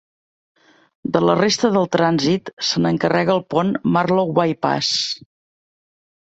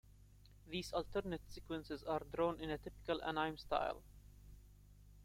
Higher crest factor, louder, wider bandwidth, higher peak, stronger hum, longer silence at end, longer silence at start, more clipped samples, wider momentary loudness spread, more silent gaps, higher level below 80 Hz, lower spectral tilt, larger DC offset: about the same, 18 dB vs 22 dB; first, -18 LUFS vs -43 LUFS; second, 8.2 kHz vs 16.5 kHz; first, -2 dBFS vs -22 dBFS; second, none vs 50 Hz at -60 dBFS; first, 1.15 s vs 0 s; first, 1.05 s vs 0.05 s; neither; second, 5 LU vs 23 LU; first, 2.53-2.57 s vs none; about the same, -58 dBFS vs -60 dBFS; about the same, -5 dB/octave vs -5.5 dB/octave; neither